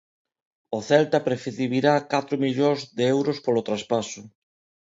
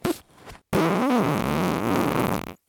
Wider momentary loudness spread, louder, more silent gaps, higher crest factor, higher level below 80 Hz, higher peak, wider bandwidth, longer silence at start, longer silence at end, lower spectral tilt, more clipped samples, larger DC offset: first, 9 LU vs 6 LU; about the same, -24 LUFS vs -24 LUFS; neither; about the same, 20 dB vs 20 dB; second, -68 dBFS vs -48 dBFS; about the same, -6 dBFS vs -4 dBFS; second, 7.8 kHz vs 19.5 kHz; first, 0.7 s vs 0.05 s; first, 0.55 s vs 0.15 s; about the same, -5.5 dB/octave vs -6 dB/octave; neither; neither